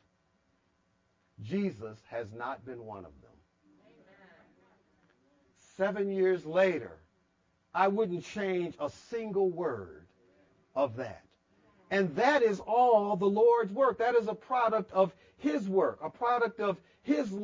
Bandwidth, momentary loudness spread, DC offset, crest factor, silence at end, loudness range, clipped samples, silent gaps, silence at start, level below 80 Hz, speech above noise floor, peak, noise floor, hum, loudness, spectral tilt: 7.6 kHz; 16 LU; under 0.1%; 18 dB; 0 s; 13 LU; under 0.1%; none; 1.4 s; -70 dBFS; 44 dB; -12 dBFS; -74 dBFS; none; -30 LUFS; -6.5 dB/octave